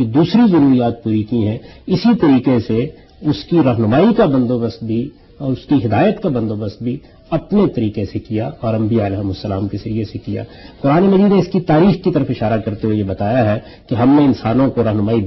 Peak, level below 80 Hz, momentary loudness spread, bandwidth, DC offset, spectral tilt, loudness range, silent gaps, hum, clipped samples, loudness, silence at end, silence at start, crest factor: -2 dBFS; -42 dBFS; 12 LU; 6 kHz; under 0.1%; -9.5 dB/octave; 4 LU; none; none; under 0.1%; -16 LUFS; 0 s; 0 s; 12 dB